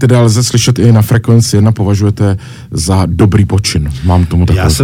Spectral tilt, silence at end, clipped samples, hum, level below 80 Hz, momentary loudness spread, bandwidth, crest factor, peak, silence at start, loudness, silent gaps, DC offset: -6 dB/octave; 0 s; under 0.1%; none; -24 dBFS; 6 LU; 16 kHz; 8 dB; 0 dBFS; 0 s; -10 LUFS; none; under 0.1%